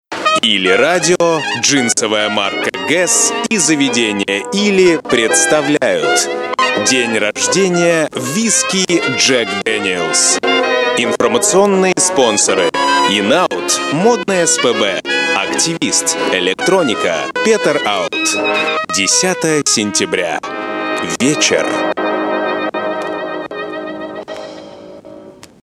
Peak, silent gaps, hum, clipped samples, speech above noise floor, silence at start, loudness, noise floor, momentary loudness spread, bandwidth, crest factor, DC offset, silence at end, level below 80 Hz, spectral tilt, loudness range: 0 dBFS; none; none; under 0.1%; 23 dB; 0.1 s; -13 LUFS; -36 dBFS; 8 LU; 14 kHz; 14 dB; under 0.1%; 0.35 s; -58 dBFS; -2 dB/octave; 4 LU